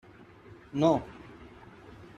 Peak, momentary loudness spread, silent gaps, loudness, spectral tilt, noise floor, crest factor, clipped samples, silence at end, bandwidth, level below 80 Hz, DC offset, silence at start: -12 dBFS; 26 LU; none; -28 LUFS; -7.5 dB/octave; -52 dBFS; 22 dB; under 0.1%; 0.1 s; 10 kHz; -60 dBFS; under 0.1%; 0.75 s